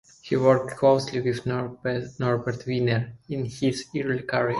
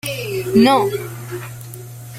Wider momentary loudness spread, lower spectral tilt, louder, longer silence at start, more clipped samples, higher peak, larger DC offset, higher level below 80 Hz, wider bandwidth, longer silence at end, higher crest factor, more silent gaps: second, 9 LU vs 21 LU; about the same, -6.5 dB/octave vs -5.5 dB/octave; second, -25 LUFS vs -16 LUFS; first, 0.25 s vs 0.05 s; neither; second, -6 dBFS vs 0 dBFS; neither; second, -58 dBFS vs -52 dBFS; second, 11.5 kHz vs 16.5 kHz; about the same, 0 s vs 0 s; about the same, 18 dB vs 18 dB; neither